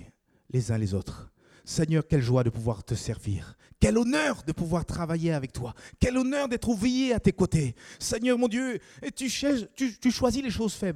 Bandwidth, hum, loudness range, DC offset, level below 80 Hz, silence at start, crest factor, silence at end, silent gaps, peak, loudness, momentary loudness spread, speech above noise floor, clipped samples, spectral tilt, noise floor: 15.5 kHz; none; 2 LU; under 0.1%; -44 dBFS; 0 s; 22 dB; 0 s; none; -6 dBFS; -28 LUFS; 10 LU; 27 dB; under 0.1%; -5.5 dB/octave; -54 dBFS